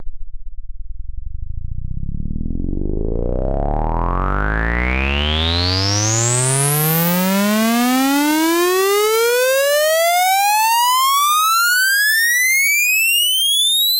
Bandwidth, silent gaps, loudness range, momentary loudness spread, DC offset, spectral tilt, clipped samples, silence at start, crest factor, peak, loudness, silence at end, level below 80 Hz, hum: 16.5 kHz; none; 12 LU; 15 LU; under 0.1%; -3 dB/octave; under 0.1%; 0 s; 14 dB; -2 dBFS; -15 LUFS; 0 s; -26 dBFS; none